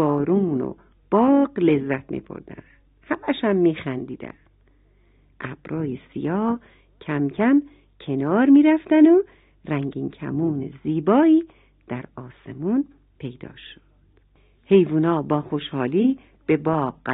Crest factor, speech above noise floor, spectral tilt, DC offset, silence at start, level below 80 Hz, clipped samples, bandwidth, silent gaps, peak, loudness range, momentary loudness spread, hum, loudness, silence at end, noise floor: 18 dB; 37 dB; -11.5 dB/octave; under 0.1%; 0 s; -58 dBFS; under 0.1%; 4 kHz; none; -4 dBFS; 8 LU; 21 LU; none; -21 LUFS; 0 s; -58 dBFS